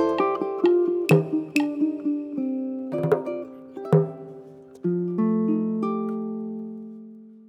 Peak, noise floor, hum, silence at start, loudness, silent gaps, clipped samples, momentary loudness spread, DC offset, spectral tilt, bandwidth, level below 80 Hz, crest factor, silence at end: -6 dBFS; -44 dBFS; none; 0 s; -25 LUFS; none; under 0.1%; 18 LU; under 0.1%; -8 dB/octave; 15 kHz; -70 dBFS; 20 dB; 0.05 s